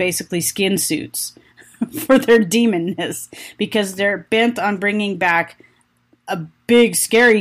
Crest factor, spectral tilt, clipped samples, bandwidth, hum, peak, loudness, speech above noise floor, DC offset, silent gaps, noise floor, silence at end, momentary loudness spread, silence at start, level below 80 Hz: 14 dB; -3.5 dB/octave; under 0.1%; 15.5 kHz; none; -4 dBFS; -17 LUFS; 42 dB; under 0.1%; none; -59 dBFS; 0 s; 14 LU; 0 s; -58 dBFS